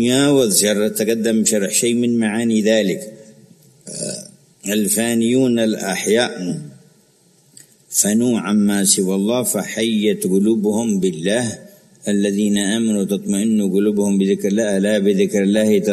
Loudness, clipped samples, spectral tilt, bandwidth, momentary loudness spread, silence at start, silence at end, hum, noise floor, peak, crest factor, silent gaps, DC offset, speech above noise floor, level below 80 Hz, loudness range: -17 LUFS; under 0.1%; -4 dB/octave; 13.5 kHz; 11 LU; 0 s; 0 s; none; -54 dBFS; 0 dBFS; 18 dB; none; under 0.1%; 38 dB; -60 dBFS; 3 LU